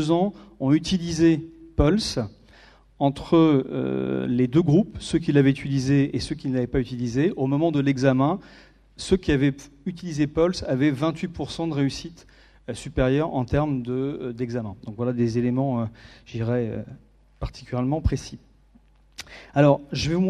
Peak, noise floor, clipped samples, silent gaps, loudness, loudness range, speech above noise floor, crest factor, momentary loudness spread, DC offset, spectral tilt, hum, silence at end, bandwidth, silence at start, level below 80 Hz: -4 dBFS; -56 dBFS; under 0.1%; none; -24 LUFS; 6 LU; 33 dB; 20 dB; 15 LU; under 0.1%; -7 dB/octave; none; 0 s; 11.5 kHz; 0 s; -40 dBFS